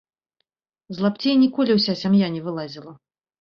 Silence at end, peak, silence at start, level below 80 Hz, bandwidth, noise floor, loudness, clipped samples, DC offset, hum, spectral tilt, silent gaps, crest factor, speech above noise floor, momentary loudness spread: 0.45 s; -6 dBFS; 0.9 s; -64 dBFS; 6.8 kHz; -77 dBFS; -20 LUFS; under 0.1%; under 0.1%; none; -7.5 dB/octave; none; 16 dB; 57 dB; 16 LU